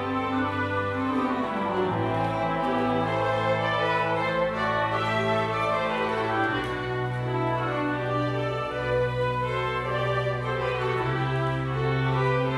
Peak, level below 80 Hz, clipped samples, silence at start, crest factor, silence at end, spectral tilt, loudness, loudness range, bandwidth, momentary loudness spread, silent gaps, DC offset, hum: -12 dBFS; -48 dBFS; under 0.1%; 0 s; 14 dB; 0 s; -7 dB/octave; -26 LUFS; 2 LU; 11.5 kHz; 3 LU; none; under 0.1%; none